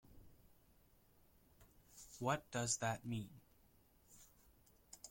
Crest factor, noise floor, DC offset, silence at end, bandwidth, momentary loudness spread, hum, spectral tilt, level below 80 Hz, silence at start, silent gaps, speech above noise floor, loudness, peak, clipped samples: 24 dB; -71 dBFS; under 0.1%; 0 s; 16.5 kHz; 24 LU; none; -3.5 dB/octave; -72 dBFS; 0.1 s; none; 29 dB; -42 LUFS; -24 dBFS; under 0.1%